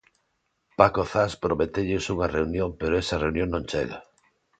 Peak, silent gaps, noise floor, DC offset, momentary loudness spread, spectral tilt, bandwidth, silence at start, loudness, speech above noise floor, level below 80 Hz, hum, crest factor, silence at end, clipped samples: 0 dBFS; none; -74 dBFS; under 0.1%; 9 LU; -6 dB/octave; 9.2 kHz; 0.8 s; -25 LUFS; 50 dB; -42 dBFS; none; 26 dB; 0.6 s; under 0.1%